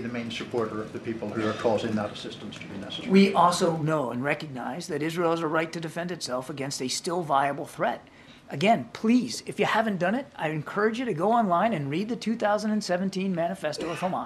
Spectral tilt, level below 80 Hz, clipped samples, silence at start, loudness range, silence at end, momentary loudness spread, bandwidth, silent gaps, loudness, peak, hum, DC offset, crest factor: -5 dB/octave; -64 dBFS; under 0.1%; 0 s; 4 LU; 0 s; 11 LU; 13 kHz; none; -27 LUFS; -8 dBFS; none; under 0.1%; 20 dB